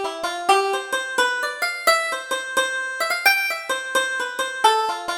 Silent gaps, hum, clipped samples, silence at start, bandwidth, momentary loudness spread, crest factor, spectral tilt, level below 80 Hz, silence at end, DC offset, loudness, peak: none; none; under 0.1%; 0 s; over 20 kHz; 7 LU; 20 dB; 0.5 dB/octave; -64 dBFS; 0 s; under 0.1%; -21 LUFS; -2 dBFS